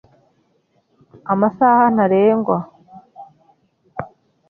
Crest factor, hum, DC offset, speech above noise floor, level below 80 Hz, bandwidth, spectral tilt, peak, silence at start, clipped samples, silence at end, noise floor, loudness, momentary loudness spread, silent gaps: 16 dB; none; under 0.1%; 48 dB; -60 dBFS; 3.3 kHz; -10.5 dB/octave; -2 dBFS; 1.25 s; under 0.1%; 0.45 s; -63 dBFS; -16 LUFS; 22 LU; none